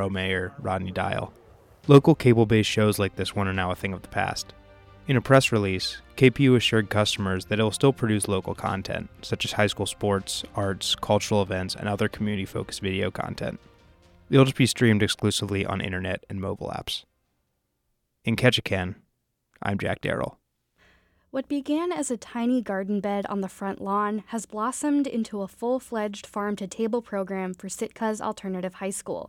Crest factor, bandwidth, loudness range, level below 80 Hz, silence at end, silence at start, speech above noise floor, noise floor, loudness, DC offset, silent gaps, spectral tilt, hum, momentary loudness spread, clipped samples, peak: 20 dB; 16.5 kHz; 7 LU; -54 dBFS; 0 s; 0 s; 51 dB; -75 dBFS; -25 LUFS; under 0.1%; none; -5.5 dB/octave; none; 13 LU; under 0.1%; -4 dBFS